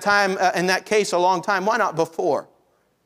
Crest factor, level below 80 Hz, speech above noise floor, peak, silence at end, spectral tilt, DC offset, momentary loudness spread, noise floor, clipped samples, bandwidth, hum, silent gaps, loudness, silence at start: 16 dB; -68 dBFS; 43 dB; -4 dBFS; 0.6 s; -3.5 dB/octave; under 0.1%; 5 LU; -63 dBFS; under 0.1%; 16 kHz; none; none; -20 LUFS; 0 s